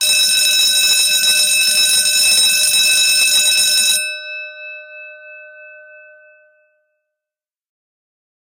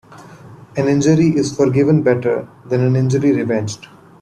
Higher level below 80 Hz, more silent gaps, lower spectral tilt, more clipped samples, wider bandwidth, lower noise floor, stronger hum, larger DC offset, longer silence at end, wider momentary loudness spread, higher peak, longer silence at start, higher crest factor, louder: second, -58 dBFS vs -52 dBFS; neither; second, 3.5 dB/octave vs -7 dB/octave; neither; first, 17 kHz vs 10.5 kHz; first, -89 dBFS vs -39 dBFS; neither; neither; first, 2.7 s vs 0.35 s; first, 17 LU vs 10 LU; about the same, -2 dBFS vs -2 dBFS; about the same, 0 s vs 0.1 s; about the same, 14 dB vs 14 dB; first, -10 LUFS vs -16 LUFS